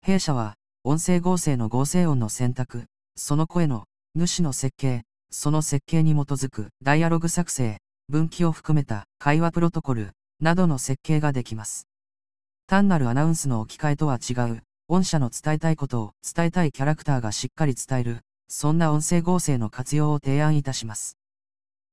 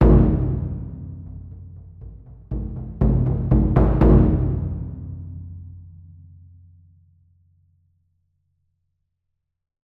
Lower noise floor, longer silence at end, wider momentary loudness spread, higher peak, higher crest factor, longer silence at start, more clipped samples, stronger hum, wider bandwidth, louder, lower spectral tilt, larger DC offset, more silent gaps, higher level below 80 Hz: first, under -90 dBFS vs -78 dBFS; second, 0.8 s vs 4.1 s; second, 10 LU vs 26 LU; about the same, -2 dBFS vs -4 dBFS; about the same, 20 dB vs 18 dB; about the same, 0 s vs 0 s; neither; neither; first, 11 kHz vs 3.1 kHz; second, -24 LUFS vs -20 LUFS; second, -5.5 dB/octave vs -12 dB/octave; first, 3% vs under 0.1%; first, 12.63-12.68 s vs none; second, -46 dBFS vs -26 dBFS